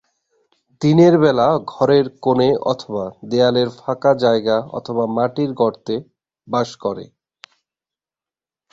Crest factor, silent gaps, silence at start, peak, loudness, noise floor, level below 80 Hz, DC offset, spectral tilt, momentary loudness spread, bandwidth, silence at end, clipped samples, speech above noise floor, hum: 16 dB; none; 0.8 s; -2 dBFS; -18 LUFS; under -90 dBFS; -58 dBFS; under 0.1%; -7 dB/octave; 13 LU; 7.8 kHz; 1.65 s; under 0.1%; over 73 dB; none